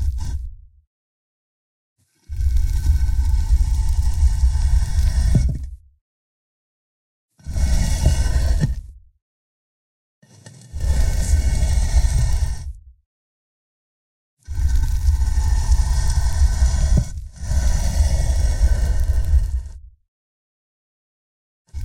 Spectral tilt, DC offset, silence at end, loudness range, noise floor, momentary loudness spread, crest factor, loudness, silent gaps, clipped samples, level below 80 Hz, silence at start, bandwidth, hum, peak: -5.5 dB/octave; under 0.1%; 0 s; 5 LU; -44 dBFS; 12 LU; 16 dB; -21 LUFS; 0.87-1.96 s, 6.01-7.29 s, 9.22-10.22 s, 13.06-14.37 s, 20.08-21.65 s; under 0.1%; -20 dBFS; 0 s; 13.5 kHz; none; -4 dBFS